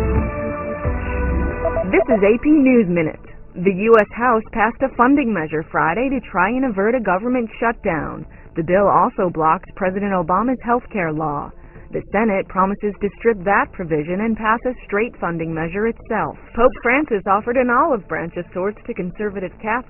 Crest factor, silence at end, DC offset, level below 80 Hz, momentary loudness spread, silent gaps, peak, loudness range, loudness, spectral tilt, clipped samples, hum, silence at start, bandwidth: 18 dB; 0.05 s; under 0.1%; -34 dBFS; 10 LU; none; 0 dBFS; 4 LU; -19 LUFS; -10 dB/octave; under 0.1%; none; 0 s; 3.3 kHz